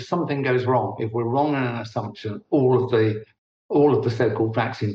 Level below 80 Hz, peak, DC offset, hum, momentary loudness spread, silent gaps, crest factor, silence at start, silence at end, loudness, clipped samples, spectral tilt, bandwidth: -62 dBFS; -8 dBFS; under 0.1%; none; 10 LU; 3.38-3.69 s; 14 dB; 0 s; 0 s; -22 LUFS; under 0.1%; -8.5 dB/octave; 7.4 kHz